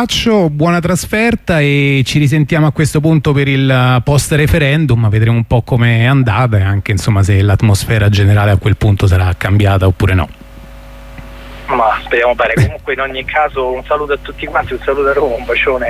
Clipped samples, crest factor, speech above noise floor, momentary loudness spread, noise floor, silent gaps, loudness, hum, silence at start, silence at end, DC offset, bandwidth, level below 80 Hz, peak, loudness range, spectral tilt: under 0.1%; 10 dB; 21 dB; 6 LU; -32 dBFS; none; -12 LUFS; none; 0 s; 0 s; under 0.1%; 14.5 kHz; -30 dBFS; 0 dBFS; 4 LU; -6 dB/octave